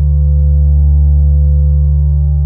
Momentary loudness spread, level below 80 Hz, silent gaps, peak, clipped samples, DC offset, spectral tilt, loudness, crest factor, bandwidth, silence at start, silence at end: 2 LU; -10 dBFS; none; -2 dBFS; under 0.1%; under 0.1%; -15 dB/octave; -11 LUFS; 6 dB; 1 kHz; 0 s; 0 s